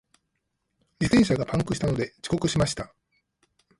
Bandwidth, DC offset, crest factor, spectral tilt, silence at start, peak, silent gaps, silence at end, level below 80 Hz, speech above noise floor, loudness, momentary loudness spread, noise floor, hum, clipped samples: 11.5 kHz; under 0.1%; 20 dB; -5.5 dB/octave; 1 s; -8 dBFS; none; 0.95 s; -46 dBFS; 52 dB; -25 LUFS; 9 LU; -78 dBFS; none; under 0.1%